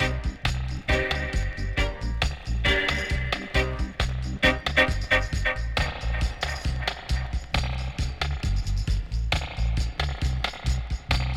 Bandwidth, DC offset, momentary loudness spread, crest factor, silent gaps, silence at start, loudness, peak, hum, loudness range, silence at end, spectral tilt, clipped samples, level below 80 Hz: 13 kHz; under 0.1%; 7 LU; 18 dB; none; 0 s; -27 LUFS; -8 dBFS; none; 4 LU; 0 s; -4.5 dB/octave; under 0.1%; -28 dBFS